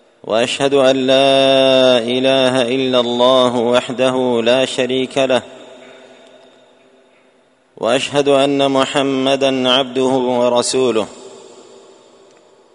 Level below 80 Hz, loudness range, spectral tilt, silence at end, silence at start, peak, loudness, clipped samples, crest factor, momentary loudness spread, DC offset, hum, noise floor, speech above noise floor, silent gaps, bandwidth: -60 dBFS; 8 LU; -4 dB/octave; 1.3 s; 0.25 s; 0 dBFS; -14 LUFS; under 0.1%; 16 dB; 6 LU; under 0.1%; none; -54 dBFS; 40 dB; none; 10.5 kHz